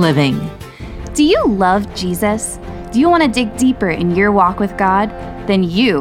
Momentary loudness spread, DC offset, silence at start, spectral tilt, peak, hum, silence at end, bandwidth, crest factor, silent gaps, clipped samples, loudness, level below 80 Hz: 12 LU; under 0.1%; 0 s; -5.5 dB/octave; 0 dBFS; none; 0 s; 16 kHz; 14 dB; none; under 0.1%; -15 LUFS; -34 dBFS